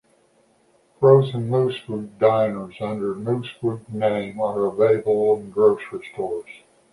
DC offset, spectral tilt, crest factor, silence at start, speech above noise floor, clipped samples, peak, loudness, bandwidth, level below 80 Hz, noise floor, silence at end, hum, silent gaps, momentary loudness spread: under 0.1%; -8.5 dB/octave; 20 dB; 1 s; 39 dB; under 0.1%; -2 dBFS; -21 LUFS; 11.5 kHz; -62 dBFS; -60 dBFS; 0.35 s; none; none; 13 LU